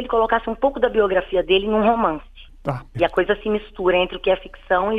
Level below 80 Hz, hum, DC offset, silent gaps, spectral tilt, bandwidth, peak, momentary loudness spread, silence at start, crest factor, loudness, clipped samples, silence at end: -40 dBFS; none; under 0.1%; none; -7.5 dB/octave; 5 kHz; -4 dBFS; 9 LU; 0 s; 16 dB; -20 LUFS; under 0.1%; 0 s